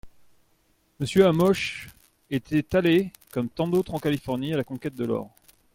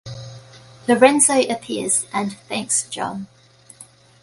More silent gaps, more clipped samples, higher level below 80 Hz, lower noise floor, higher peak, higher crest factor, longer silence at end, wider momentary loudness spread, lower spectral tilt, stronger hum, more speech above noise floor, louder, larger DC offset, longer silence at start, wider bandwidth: neither; neither; first, -54 dBFS vs -62 dBFS; first, -66 dBFS vs -47 dBFS; second, -6 dBFS vs 0 dBFS; about the same, 20 dB vs 20 dB; about the same, 0.45 s vs 0.4 s; second, 12 LU vs 22 LU; first, -6.5 dB/octave vs -2.5 dB/octave; neither; first, 42 dB vs 28 dB; second, -25 LUFS vs -18 LUFS; neither; about the same, 0.05 s vs 0.05 s; first, 16.5 kHz vs 12 kHz